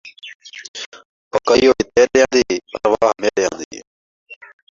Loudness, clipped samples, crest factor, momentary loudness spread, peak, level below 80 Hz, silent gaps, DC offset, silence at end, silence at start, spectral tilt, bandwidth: -16 LUFS; under 0.1%; 16 dB; 21 LU; -2 dBFS; -50 dBFS; 0.35-0.40 s, 0.68-0.74 s, 0.86-0.92 s, 1.05-1.31 s, 3.65-3.71 s, 3.87-4.26 s; under 0.1%; 0.35 s; 0.05 s; -3.5 dB/octave; 7.6 kHz